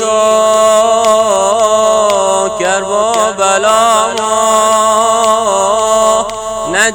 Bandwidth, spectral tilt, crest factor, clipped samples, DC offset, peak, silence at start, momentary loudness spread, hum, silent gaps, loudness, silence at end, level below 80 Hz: 18 kHz; -1.5 dB/octave; 10 dB; under 0.1%; under 0.1%; 0 dBFS; 0 s; 4 LU; none; none; -10 LUFS; 0 s; -46 dBFS